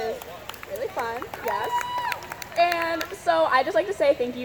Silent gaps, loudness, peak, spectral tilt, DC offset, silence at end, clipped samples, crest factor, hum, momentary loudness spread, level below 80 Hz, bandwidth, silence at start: none; -25 LUFS; -6 dBFS; -3.5 dB/octave; under 0.1%; 0 s; under 0.1%; 20 dB; none; 12 LU; -58 dBFS; over 20 kHz; 0 s